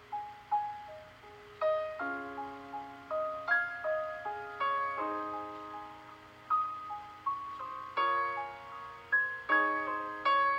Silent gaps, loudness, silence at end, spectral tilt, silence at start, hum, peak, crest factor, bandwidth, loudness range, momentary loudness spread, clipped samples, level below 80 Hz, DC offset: none; -34 LUFS; 0 s; -4.5 dB/octave; 0 s; none; -16 dBFS; 18 dB; 15.5 kHz; 4 LU; 16 LU; under 0.1%; -72 dBFS; under 0.1%